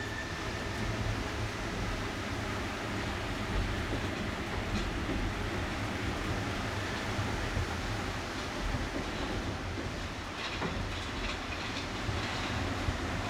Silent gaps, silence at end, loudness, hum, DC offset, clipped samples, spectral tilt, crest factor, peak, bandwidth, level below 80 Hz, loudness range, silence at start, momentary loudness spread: none; 0 s; -35 LUFS; none; under 0.1%; under 0.1%; -5 dB/octave; 16 dB; -18 dBFS; 16.5 kHz; -42 dBFS; 1 LU; 0 s; 3 LU